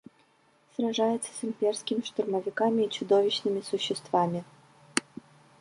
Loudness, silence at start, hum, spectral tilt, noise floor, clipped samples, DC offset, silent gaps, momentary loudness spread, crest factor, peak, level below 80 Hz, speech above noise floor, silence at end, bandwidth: -29 LUFS; 0.8 s; none; -4 dB/octave; -65 dBFS; under 0.1%; under 0.1%; none; 9 LU; 26 dB; -4 dBFS; -78 dBFS; 37 dB; 0.6 s; 11.5 kHz